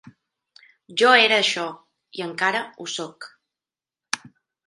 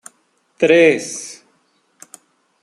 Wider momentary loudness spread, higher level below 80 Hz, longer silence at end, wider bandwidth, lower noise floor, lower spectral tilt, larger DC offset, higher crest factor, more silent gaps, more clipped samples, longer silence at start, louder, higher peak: first, 22 LU vs 18 LU; second, -78 dBFS vs -66 dBFS; second, 0.5 s vs 1.3 s; about the same, 11.5 kHz vs 12 kHz; first, under -90 dBFS vs -62 dBFS; second, -1.5 dB/octave vs -4 dB/octave; neither; first, 24 dB vs 18 dB; neither; neither; second, 0.05 s vs 0.6 s; second, -20 LUFS vs -14 LUFS; about the same, -2 dBFS vs -2 dBFS